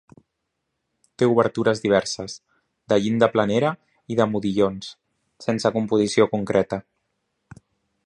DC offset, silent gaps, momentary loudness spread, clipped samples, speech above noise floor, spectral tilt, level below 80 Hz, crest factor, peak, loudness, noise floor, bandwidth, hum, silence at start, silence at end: under 0.1%; none; 13 LU; under 0.1%; 57 dB; -5.5 dB/octave; -58 dBFS; 20 dB; -2 dBFS; -22 LUFS; -78 dBFS; 11 kHz; none; 1.2 s; 1.25 s